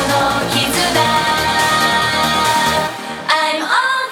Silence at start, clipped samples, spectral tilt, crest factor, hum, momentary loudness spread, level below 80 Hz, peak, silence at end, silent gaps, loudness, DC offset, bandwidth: 0 s; under 0.1%; -2.5 dB/octave; 14 dB; none; 3 LU; -42 dBFS; -2 dBFS; 0 s; none; -14 LUFS; under 0.1%; over 20 kHz